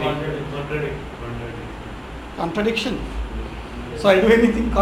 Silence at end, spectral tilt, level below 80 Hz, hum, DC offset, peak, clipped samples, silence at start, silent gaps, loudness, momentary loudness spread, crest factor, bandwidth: 0 s; -6 dB/octave; -34 dBFS; none; under 0.1%; -2 dBFS; under 0.1%; 0 s; none; -21 LUFS; 18 LU; 20 dB; 16 kHz